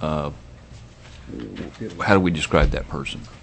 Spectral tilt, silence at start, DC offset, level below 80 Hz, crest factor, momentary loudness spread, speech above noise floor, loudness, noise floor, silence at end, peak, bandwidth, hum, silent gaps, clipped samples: -6 dB/octave; 0 s; under 0.1%; -32 dBFS; 24 dB; 25 LU; 20 dB; -22 LUFS; -43 dBFS; 0.05 s; 0 dBFS; 8.6 kHz; none; none; under 0.1%